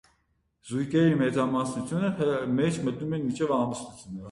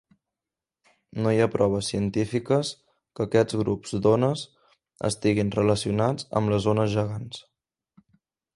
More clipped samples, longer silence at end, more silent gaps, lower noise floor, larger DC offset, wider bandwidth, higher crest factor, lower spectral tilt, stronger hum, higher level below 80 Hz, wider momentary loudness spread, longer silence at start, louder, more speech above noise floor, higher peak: neither; second, 0 s vs 1.15 s; neither; second, -72 dBFS vs -89 dBFS; neither; about the same, 11.5 kHz vs 11.5 kHz; about the same, 16 dB vs 20 dB; about the same, -6.5 dB/octave vs -6 dB/octave; neither; second, -60 dBFS vs -54 dBFS; about the same, 10 LU vs 11 LU; second, 0.65 s vs 1.15 s; about the same, -27 LUFS vs -25 LUFS; second, 45 dB vs 65 dB; second, -12 dBFS vs -6 dBFS